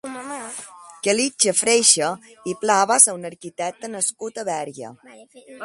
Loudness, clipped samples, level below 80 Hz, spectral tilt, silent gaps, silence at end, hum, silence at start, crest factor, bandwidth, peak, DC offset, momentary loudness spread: -18 LUFS; under 0.1%; -70 dBFS; -1 dB/octave; none; 0 s; none; 0.05 s; 22 dB; 12 kHz; 0 dBFS; under 0.1%; 19 LU